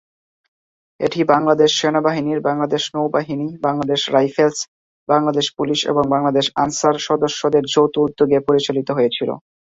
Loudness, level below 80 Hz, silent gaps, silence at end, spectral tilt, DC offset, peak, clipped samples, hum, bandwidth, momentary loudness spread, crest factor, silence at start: -18 LUFS; -58 dBFS; 4.68-5.07 s; 0.25 s; -4.5 dB/octave; under 0.1%; -2 dBFS; under 0.1%; none; 7.8 kHz; 6 LU; 16 dB; 1 s